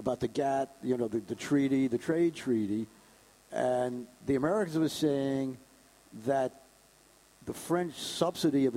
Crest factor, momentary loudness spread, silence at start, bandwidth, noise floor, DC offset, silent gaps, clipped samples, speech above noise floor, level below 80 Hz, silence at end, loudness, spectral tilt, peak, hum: 18 dB; 11 LU; 0 s; 16 kHz; -61 dBFS; under 0.1%; none; under 0.1%; 31 dB; -66 dBFS; 0 s; -31 LUFS; -6 dB/octave; -12 dBFS; none